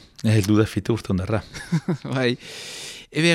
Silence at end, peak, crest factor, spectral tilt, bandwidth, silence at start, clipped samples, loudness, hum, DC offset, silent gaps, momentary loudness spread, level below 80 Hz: 0 s; -4 dBFS; 18 dB; -5.5 dB/octave; 14.5 kHz; 0.2 s; under 0.1%; -23 LUFS; none; under 0.1%; none; 13 LU; -50 dBFS